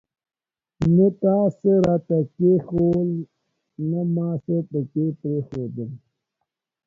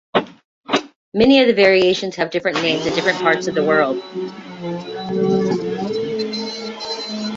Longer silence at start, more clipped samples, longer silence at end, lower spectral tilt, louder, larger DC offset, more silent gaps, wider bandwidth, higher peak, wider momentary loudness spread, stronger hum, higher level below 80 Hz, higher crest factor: first, 0.8 s vs 0.15 s; neither; first, 0.9 s vs 0 s; first, -11 dB/octave vs -5 dB/octave; second, -22 LUFS vs -18 LUFS; neither; second, none vs 0.44-0.63 s, 0.96-1.12 s; second, 7 kHz vs 7.8 kHz; second, -6 dBFS vs -2 dBFS; about the same, 13 LU vs 15 LU; neither; about the same, -54 dBFS vs -54 dBFS; about the same, 16 dB vs 18 dB